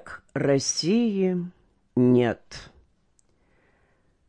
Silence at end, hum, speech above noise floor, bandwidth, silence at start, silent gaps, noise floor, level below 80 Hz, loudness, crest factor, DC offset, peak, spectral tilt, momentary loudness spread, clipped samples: 1.65 s; none; 43 dB; 10.5 kHz; 0.05 s; none; -66 dBFS; -60 dBFS; -24 LUFS; 16 dB; under 0.1%; -10 dBFS; -5 dB/octave; 18 LU; under 0.1%